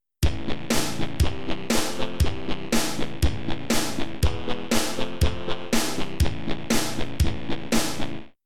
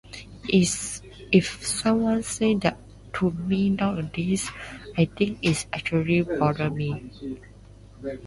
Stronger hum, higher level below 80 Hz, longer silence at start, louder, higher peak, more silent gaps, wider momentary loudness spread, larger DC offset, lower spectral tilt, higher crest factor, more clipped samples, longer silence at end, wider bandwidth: neither; first, -32 dBFS vs -48 dBFS; about the same, 0 s vs 0.05 s; about the same, -27 LUFS vs -25 LUFS; second, -10 dBFS vs -6 dBFS; neither; second, 7 LU vs 15 LU; first, 5% vs under 0.1%; about the same, -4 dB/octave vs -5 dB/octave; about the same, 16 dB vs 20 dB; neither; about the same, 0 s vs 0 s; first, 18 kHz vs 11.5 kHz